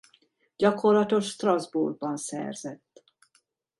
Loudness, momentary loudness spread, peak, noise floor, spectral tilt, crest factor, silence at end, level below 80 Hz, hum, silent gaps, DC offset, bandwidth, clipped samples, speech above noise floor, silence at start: -26 LUFS; 13 LU; -8 dBFS; -70 dBFS; -5 dB/octave; 20 dB; 1.05 s; -74 dBFS; none; none; under 0.1%; 11.5 kHz; under 0.1%; 44 dB; 0.6 s